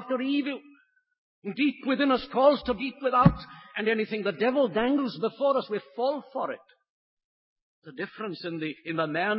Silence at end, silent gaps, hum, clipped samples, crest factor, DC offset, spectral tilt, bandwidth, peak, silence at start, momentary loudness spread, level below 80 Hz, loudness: 0 s; 1.18-1.42 s, 6.90-7.17 s, 7.24-7.56 s, 7.62-7.82 s; none; under 0.1%; 24 dB; under 0.1%; -10.5 dB/octave; 5.8 kHz; -4 dBFS; 0 s; 15 LU; -52 dBFS; -27 LUFS